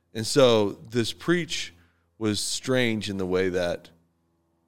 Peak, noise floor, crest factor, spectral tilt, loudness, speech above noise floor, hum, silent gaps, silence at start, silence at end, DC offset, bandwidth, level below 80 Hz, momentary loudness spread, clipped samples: -6 dBFS; -70 dBFS; 20 dB; -4.5 dB/octave; -25 LUFS; 45 dB; none; none; 0 s; 0 s; 0.4%; 17 kHz; -60 dBFS; 11 LU; under 0.1%